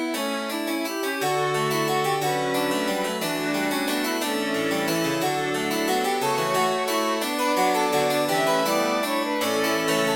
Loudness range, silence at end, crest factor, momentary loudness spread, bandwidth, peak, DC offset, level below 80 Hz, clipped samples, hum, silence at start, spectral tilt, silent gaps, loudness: 2 LU; 0 s; 14 dB; 4 LU; 17 kHz; -10 dBFS; under 0.1%; -66 dBFS; under 0.1%; none; 0 s; -3.5 dB/octave; none; -23 LUFS